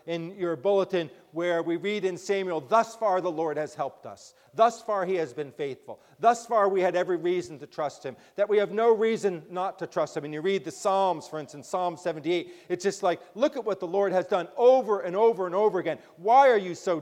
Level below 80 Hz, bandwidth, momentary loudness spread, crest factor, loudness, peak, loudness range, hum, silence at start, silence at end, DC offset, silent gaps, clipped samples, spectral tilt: -78 dBFS; 14.5 kHz; 12 LU; 18 dB; -26 LUFS; -8 dBFS; 4 LU; none; 0.05 s; 0 s; under 0.1%; none; under 0.1%; -5 dB/octave